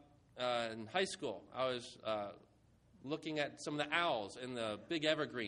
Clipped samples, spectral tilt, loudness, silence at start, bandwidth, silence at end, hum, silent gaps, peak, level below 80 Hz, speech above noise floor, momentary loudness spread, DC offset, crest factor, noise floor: under 0.1%; -4 dB/octave; -40 LUFS; 0.35 s; 11 kHz; 0 s; none; none; -18 dBFS; -76 dBFS; 28 dB; 9 LU; under 0.1%; 22 dB; -68 dBFS